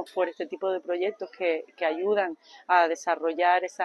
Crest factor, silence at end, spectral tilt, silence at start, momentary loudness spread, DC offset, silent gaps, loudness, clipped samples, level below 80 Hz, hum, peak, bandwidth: 20 dB; 0 s; -3 dB/octave; 0 s; 8 LU; under 0.1%; none; -27 LUFS; under 0.1%; -82 dBFS; none; -8 dBFS; 12 kHz